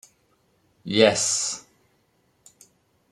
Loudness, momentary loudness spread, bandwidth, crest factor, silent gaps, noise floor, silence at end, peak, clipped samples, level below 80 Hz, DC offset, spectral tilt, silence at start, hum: -21 LUFS; 18 LU; 13 kHz; 24 dB; none; -66 dBFS; 1.5 s; -2 dBFS; under 0.1%; -68 dBFS; under 0.1%; -2.5 dB/octave; 0.85 s; none